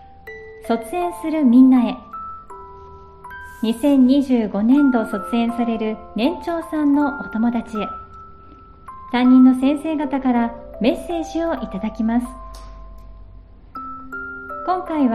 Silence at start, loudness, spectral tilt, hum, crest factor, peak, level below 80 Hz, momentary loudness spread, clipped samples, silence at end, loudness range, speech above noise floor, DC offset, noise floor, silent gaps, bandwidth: 0.25 s; -18 LUFS; -6.5 dB/octave; none; 16 dB; -4 dBFS; -44 dBFS; 23 LU; under 0.1%; 0 s; 7 LU; 25 dB; under 0.1%; -43 dBFS; none; 12.5 kHz